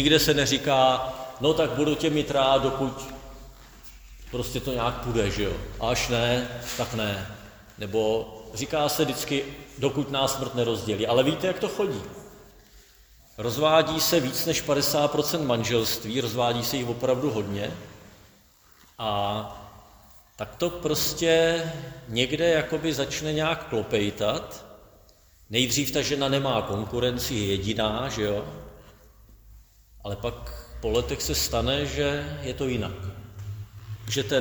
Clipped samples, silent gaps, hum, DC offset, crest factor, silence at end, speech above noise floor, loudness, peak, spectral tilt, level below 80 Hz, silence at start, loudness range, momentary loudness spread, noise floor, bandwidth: under 0.1%; none; none; under 0.1%; 22 dB; 0 s; 31 dB; -26 LUFS; -6 dBFS; -4 dB/octave; -46 dBFS; 0 s; 6 LU; 17 LU; -57 dBFS; over 20 kHz